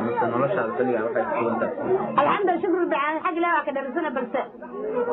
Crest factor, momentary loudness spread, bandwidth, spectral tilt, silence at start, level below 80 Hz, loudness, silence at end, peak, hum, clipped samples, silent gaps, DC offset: 16 dB; 7 LU; 4.1 kHz; -4.5 dB/octave; 0 s; -66 dBFS; -24 LUFS; 0 s; -8 dBFS; none; under 0.1%; none; under 0.1%